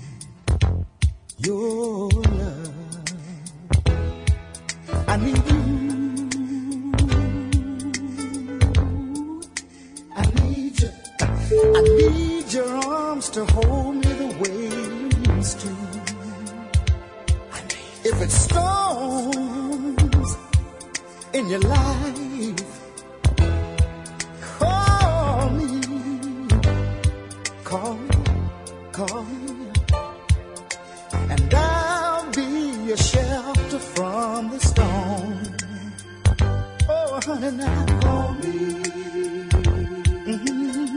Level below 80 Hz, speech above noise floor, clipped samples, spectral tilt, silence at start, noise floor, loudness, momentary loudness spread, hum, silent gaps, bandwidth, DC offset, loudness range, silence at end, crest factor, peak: -28 dBFS; 23 dB; under 0.1%; -5.5 dB/octave; 0 s; -42 dBFS; -23 LUFS; 12 LU; none; none; 11 kHz; under 0.1%; 5 LU; 0 s; 18 dB; -4 dBFS